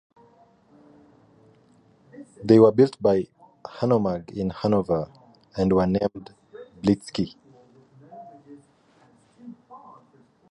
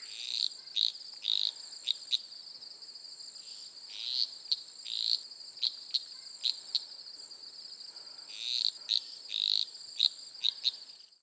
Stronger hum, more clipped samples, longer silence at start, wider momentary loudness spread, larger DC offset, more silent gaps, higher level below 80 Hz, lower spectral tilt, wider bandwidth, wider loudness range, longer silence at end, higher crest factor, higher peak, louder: neither; neither; first, 2.2 s vs 0 s; first, 28 LU vs 16 LU; neither; neither; first, -54 dBFS vs under -90 dBFS; first, -8 dB/octave vs 3 dB/octave; first, 11.5 kHz vs 8 kHz; first, 10 LU vs 4 LU; first, 0.75 s vs 0.2 s; second, 22 dB vs 28 dB; first, -2 dBFS vs -8 dBFS; first, -22 LUFS vs -32 LUFS